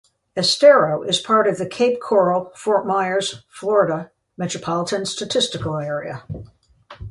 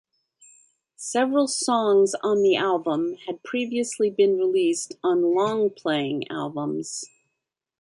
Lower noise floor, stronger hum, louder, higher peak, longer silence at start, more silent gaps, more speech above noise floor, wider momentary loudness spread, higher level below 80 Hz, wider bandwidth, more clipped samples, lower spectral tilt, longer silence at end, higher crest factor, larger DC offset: second, -41 dBFS vs -82 dBFS; neither; first, -19 LUFS vs -23 LUFS; first, 0 dBFS vs -10 dBFS; second, 0.35 s vs 1 s; neither; second, 22 dB vs 59 dB; first, 16 LU vs 10 LU; first, -52 dBFS vs -74 dBFS; about the same, 11.5 kHz vs 11.5 kHz; neither; about the same, -4 dB/octave vs -4 dB/octave; second, 0 s vs 0.75 s; first, 20 dB vs 14 dB; neither